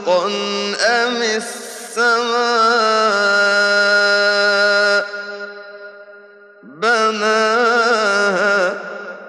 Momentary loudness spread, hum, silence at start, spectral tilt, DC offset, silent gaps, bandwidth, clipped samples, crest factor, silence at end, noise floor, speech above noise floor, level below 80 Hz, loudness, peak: 14 LU; none; 0 s; -2 dB/octave; under 0.1%; none; 13 kHz; under 0.1%; 14 dB; 0 s; -42 dBFS; 27 dB; -78 dBFS; -15 LUFS; -4 dBFS